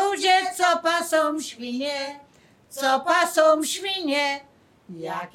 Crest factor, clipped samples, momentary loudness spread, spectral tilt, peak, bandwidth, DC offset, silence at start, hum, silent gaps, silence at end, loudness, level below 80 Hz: 18 dB; under 0.1%; 14 LU; -1.5 dB/octave; -6 dBFS; 17.5 kHz; under 0.1%; 0 s; none; none; 0.05 s; -22 LUFS; -74 dBFS